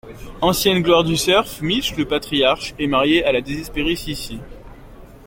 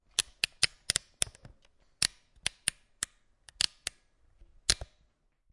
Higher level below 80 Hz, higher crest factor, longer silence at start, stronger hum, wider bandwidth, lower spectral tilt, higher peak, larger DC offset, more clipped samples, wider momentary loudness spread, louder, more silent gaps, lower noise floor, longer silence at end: first, -38 dBFS vs -54 dBFS; second, 18 dB vs 34 dB; second, 0.05 s vs 0.2 s; neither; first, 17 kHz vs 11.5 kHz; first, -4 dB/octave vs 0.5 dB/octave; about the same, -2 dBFS vs -4 dBFS; neither; neither; about the same, 12 LU vs 10 LU; first, -18 LUFS vs -32 LUFS; neither; second, -40 dBFS vs -71 dBFS; second, 0 s vs 0.7 s